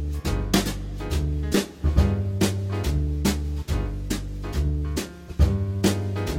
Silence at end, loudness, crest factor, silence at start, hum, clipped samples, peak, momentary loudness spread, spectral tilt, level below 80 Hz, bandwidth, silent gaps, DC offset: 0 s; -26 LUFS; 18 dB; 0 s; none; under 0.1%; -6 dBFS; 8 LU; -5.5 dB/octave; -28 dBFS; 17 kHz; none; under 0.1%